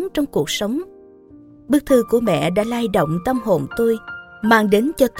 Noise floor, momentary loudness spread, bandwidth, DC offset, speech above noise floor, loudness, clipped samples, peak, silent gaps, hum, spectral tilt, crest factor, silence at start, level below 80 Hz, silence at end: -44 dBFS; 9 LU; 17 kHz; under 0.1%; 27 dB; -18 LUFS; under 0.1%; 0 dBFS; none; none; -5.5 dB/octave; 18 dB; 0 s; -46 dBFS; 0 s